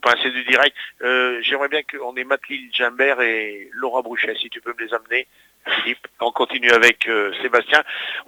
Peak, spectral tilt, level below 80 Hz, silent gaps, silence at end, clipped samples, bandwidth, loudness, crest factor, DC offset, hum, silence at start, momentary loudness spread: 0 dBFS; -1.5 dB/octave; -68 dBFS; none; 0.05 s; under 0.1%; over 20 kHz; -19 LUFS; 20 dB; under 0.1%; none; 0.05 s; 12 LU